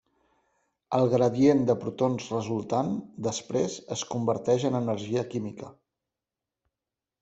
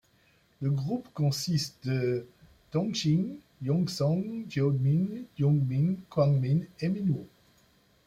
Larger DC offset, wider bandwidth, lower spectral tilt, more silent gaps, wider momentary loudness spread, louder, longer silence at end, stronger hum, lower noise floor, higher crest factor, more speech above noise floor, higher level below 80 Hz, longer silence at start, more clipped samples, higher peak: neither; second, 8.2 kHz vs 14.5 kHz; about the same, -6 dB/octave vs -7 dB/octave; neither; first, 12 LU vs 8 LU; about the same, -27 LUFS vs -29 LUFS; first, 1.5 s vs 0.8 s; neither; first, -89 dBFS vs -65 dBFS; about the same, 20 dB vs 18 dB; first, 63 dB vs 37 dB; about the same, -66 dBFS vs -62 dBFS; first, 0.9 s vs 0.6 s; neither; first, -8 dBFS vs -12 dBFS